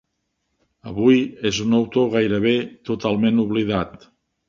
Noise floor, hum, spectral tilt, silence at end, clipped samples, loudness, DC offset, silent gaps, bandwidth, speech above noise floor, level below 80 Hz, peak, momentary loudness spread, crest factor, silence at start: -74 dBFS; none; -6 dB/octave; 0.6 s; under 0.1%; -20 LUFS; under 0.1%; none; 7.4 kHz; 55 dB; -52 dBFS; -4 dBFS; 8 LU; 18 dB; 0.85 s